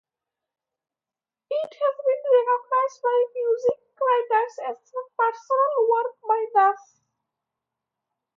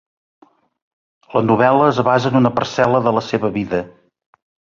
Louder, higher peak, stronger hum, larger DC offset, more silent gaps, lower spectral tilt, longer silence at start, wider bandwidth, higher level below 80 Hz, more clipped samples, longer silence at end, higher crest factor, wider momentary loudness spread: second, -23 LUFS vs -16 LUFS; second, -8 dBFS vs -2 dBFS; neither; neither; neither; second, -3 dB/octave vs -7 dB/octave; first, 1.5 s vs 1.3 s; about the same, 7.2 kHz vs 7.4 kHz; second, -80 dBFS vs -52 dBFS; neither; first, 1.6 s vs 0.9 s; about the same, 16 dB vs 16 dB; about the same, 10 LU vs 9 LU